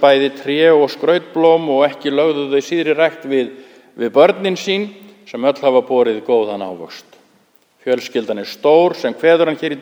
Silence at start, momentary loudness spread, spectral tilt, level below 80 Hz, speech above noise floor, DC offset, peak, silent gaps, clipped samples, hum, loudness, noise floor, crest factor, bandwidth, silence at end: 0 s; 12 LU; -5 dB/octave; -72 dBFS; 40 dB; under 0.1%; 0 dBFS; none; under 0.1%; none; -15 LUFS; -55 dBFS; 16 dB; 13.5 kHz; 0 s